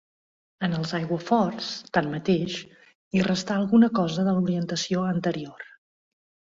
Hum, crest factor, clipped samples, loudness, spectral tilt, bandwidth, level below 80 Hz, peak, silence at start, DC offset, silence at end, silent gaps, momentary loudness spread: none; 18 dB; under 0.1%; -25 LUFS; -6 dB/octave; 7.6 kHz; -62 dBFS; -8 dBFS; 0.6 s; under 0.1%; 0.85 s; 2.95-3.11 s; 12 LU